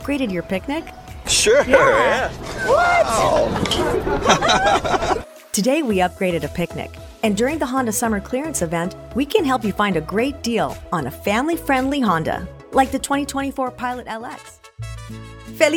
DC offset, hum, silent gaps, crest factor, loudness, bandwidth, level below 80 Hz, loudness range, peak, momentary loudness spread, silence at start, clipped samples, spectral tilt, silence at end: under 0.1%; none; none; 20 dB; -19 LUFS; 19 kHz; -38 dBFS; 5 LU; 0 dBFS; 15 LU; 0 s; under 0.1%; -4 dB/octave; 0 s